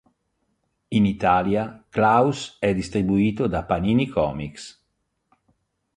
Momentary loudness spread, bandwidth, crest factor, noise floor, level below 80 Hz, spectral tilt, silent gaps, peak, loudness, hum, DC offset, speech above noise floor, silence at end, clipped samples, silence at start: 10 LU; 10.5 kHz; 18 dB; -74 dBFS; -46 dBFS; -7 dB/octave; none; -4 dBFS; -22 LUFS; none; under 0.1%; 53 dB; 1.25 s; under 0.1%; 0.9 s